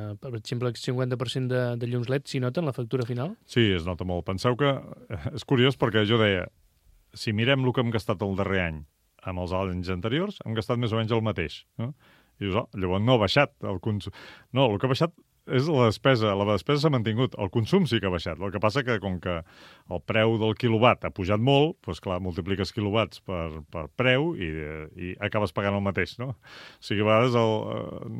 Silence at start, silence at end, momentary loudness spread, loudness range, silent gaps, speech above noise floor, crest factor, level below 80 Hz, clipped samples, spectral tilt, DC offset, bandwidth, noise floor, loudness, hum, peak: 0 s; 0 s; 13 LU; 4 LU; none; 35 dB; 22 dB; -52 dBFS; under 0.1%; -6.5 dB/octave; under 0.1%; 13.5 kHz; -61 dBFS; -26 LUFS; none; -4 dBFS